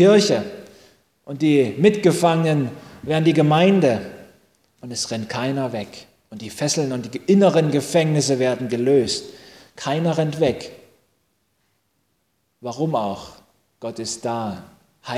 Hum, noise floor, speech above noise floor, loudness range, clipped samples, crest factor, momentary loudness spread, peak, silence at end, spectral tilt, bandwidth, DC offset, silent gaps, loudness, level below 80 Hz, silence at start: none; -69 dBFS; 50 dB; 10 LU; under 0.1%; 18 dB; 19 LU; -2 dBFS; 0 s; -5.5 dB/octave; 15 kHz; under 0.1%; none; -20 LUFS; -58 dBFS; 0 s